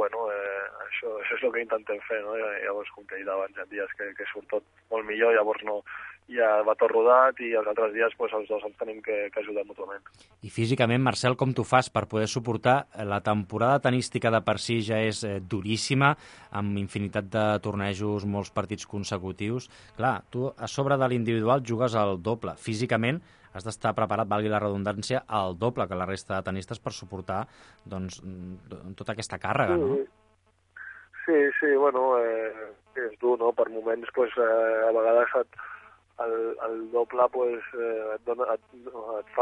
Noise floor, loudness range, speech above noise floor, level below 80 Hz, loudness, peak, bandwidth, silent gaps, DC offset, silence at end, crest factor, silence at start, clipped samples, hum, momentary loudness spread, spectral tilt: -66 dBFS; 7 LU; 39 dB; -56 dBFS; -27 LUFS; -6 dBFS; 11 kHz; none; under 0.1%; 0 s; 20 dB; 0 s; under 0.1%; none; 14 LU; -5.5 dB/octave